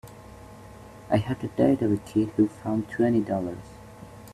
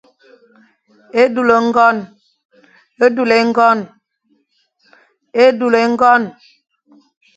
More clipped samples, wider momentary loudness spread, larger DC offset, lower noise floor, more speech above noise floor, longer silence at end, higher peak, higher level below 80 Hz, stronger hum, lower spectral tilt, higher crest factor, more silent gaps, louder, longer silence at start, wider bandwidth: neither; first, 23 LU vs 11 LU; neither; second, -45 dBFS vs -62 dBFS; second, 21 dB vs 50 dB; second, 0 s vs 1.05 s; second, -8 dBFS vs 0 dBFS; first, -54 dBFS vs -62 dBFS; neither; first, -8 dB/octave vs -5 dB/octave; about the same, 20 dB vs 16 dB; second, none vs 2.45-2.49 s; second, -26 LUFS vs -13 LUFS; second, 0.05 s vs 1.15 s; first, 14 kHz vs 8.6 kHz